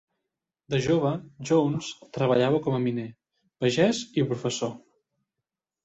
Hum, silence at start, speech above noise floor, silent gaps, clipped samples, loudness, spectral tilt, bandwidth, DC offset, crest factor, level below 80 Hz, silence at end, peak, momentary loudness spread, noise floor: none; 0.7 s; 62 dB; none; under 0.1%; -26 LUFS; -6 dB/octave; 8.2 kHz; under 0.1%; 18 dB; -62 dBFS; 1.05 s; -10 dBFS; 11 LU; -87 dBFS